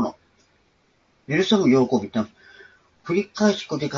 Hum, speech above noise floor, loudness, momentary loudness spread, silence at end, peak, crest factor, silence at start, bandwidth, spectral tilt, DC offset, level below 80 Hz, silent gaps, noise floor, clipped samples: none; 42 dB; -22 LUFS; 11 LU; 0 s; -6 dBFS; 18 dB; 0 s; 7.6 kHz; -5.5 dB/octave; under 0.1%; -64 dBFS; none; -63 dBFS; under 0.1%